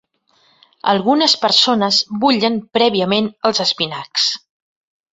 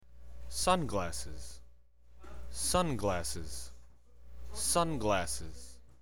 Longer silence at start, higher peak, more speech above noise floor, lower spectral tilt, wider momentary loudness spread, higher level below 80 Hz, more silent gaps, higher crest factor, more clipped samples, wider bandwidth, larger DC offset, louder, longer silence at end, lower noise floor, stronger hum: first, 0.85 s vs 0 s; first, 0 dBFS vs -12 dBFS; first, 42 dB vs 27 dB; about the same, -3.5 dB/octave vs -3.5 dB/octave; second, 6 LU vs 22 LU; second, -62 dBFS vs -48 dBFS; neither; about the same, 18 dB vs 22 dB; neither; second, 8.2 kHz vs 20 kHz; second, under 0.1% vs 0.8%; first, -15 LUFS vs -33 LUFS; first, 0.75 s vs 0 s; about the same, -58 dBFS vs -61 dBFS; second, none vs 60 Hz at -50 dBFS